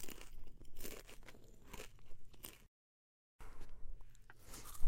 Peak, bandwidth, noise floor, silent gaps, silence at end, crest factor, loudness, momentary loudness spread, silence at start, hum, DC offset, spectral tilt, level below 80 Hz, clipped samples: -20 dBFS; 16.5 kHz; under -90 dBFS; 2.68-3.39 s; 0 s; 22 dB; -57 LUFS; 12 LU; 0 s; none; under 0.1%; -3.5 dB/octave; -50 dBFS; under 0.1%